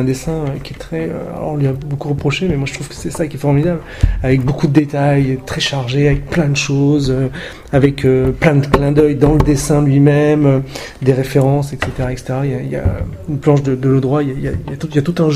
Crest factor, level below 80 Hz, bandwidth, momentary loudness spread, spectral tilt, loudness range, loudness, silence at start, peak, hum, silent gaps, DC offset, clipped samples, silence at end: 14 dB; -28 dBFS; 13.5 kHz; 10 LU; -7 dB/octave; 5 LU; -15 LUFS; 0 s; 0 dBFS; none; none; under 0.1%; under 0.1%; 0 s